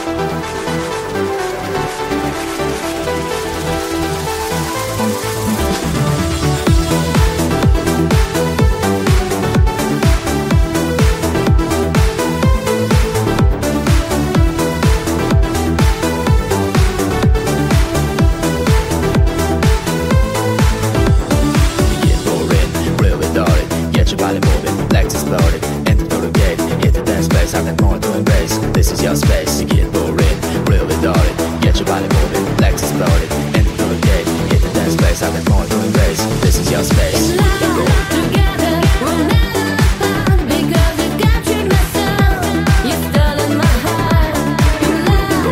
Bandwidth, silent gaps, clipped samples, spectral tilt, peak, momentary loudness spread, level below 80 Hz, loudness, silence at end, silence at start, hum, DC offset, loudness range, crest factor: 16.5 kHz; none; under 0.1%; -5.5 dB/octave; 0 dBFS; 5 LU; -18 dBFS; -15 LUFS; 0 s; 0 s; none; under 0.1%; 2 LU; 12 dB